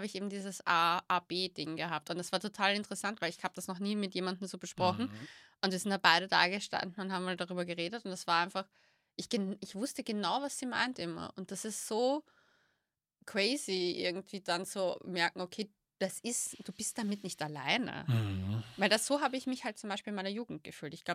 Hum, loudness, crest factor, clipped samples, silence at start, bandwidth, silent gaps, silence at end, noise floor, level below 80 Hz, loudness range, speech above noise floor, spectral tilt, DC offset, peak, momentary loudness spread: none; -35 LUFS; 28 dB; under 0.1%; 0 s; 16 kHz; none; 0 s; -85 dBFS; -78 dBFS; 5 LU; 49 dB; -3.5 dB/octave; under 0.1%; -8 dBFS; 11 LU